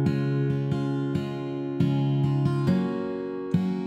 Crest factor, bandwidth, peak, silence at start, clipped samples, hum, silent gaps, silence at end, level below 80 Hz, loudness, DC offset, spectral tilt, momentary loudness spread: 14 dB; 8 kHz; -10 dBFS; 0 s; under 0.1%; none; none; 0 s; -58 dBFS; -26 LUFS; under 0.1%; -9 dB/octave; 7 LU